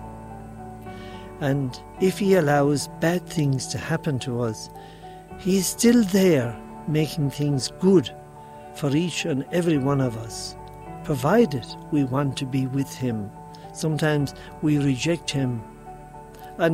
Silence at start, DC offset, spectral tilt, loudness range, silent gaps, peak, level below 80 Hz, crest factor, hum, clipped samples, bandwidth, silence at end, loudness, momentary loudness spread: 0 s; under 0.1%; -5.5 dB/octave; 4 LU; none; -6 dBFS; -50 dBFS; 18 dB; none; under 0.1%; 16 kHz; 0 s; -23 LUFS; 20 LU